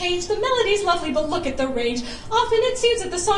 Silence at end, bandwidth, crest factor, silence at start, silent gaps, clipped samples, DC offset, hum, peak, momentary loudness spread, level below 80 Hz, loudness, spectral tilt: 0 s; 11.5 kHz; 14 dB; 0 s; none; under 0.1%; under 0.1%; none; -6 dBFS; 5 LU; -40 dBFS; -21 LUFS; -3 dB/octave